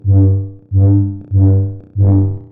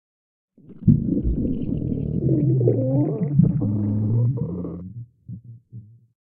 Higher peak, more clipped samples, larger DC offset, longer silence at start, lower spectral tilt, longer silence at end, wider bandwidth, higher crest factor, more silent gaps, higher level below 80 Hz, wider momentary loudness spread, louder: first, 0 dBFS vs -4 dBFS; neither; neither; second, 0.05 s vs 0.7 s; first, -16.5 dB/octave vs -14.5 dB/octave; second, 0.05 s vs 0.55 s; second, 1.3 kHz vs 2.2 kHz; second, 10 dB vs 20 dB; neither; about the same, -38 dBFS vs -36 dBFS; second, 7 LU vs 21 LU; first, -14 LUFS vs -22 LUFS